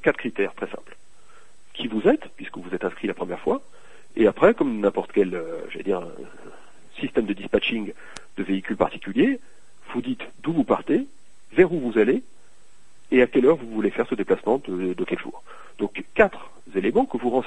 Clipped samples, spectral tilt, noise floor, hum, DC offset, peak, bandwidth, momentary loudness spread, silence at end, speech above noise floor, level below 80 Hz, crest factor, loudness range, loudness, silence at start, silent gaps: under 0.1%; -7 dB/octave; -59 dBFS; none; 1%; -2 dBFS; 10.5 kHz; 16 LU; 0 s; 36 dB; -50 dBFS; 22 dB; 5 LU; -24 LUFS; 0.05 s; none